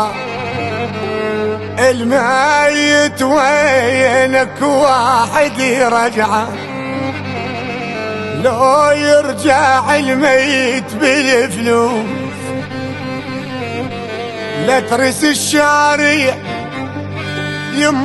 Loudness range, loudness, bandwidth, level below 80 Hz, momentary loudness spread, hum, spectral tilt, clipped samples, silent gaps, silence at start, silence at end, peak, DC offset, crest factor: 5 LU; -14 LUFS; 12.5 kHz; -50 dBFS; 12 LU; none; -4 dB/octave; under 0.1%; none; 0 s; 0 s; 0 dBFS; under 0.1%; 14 dB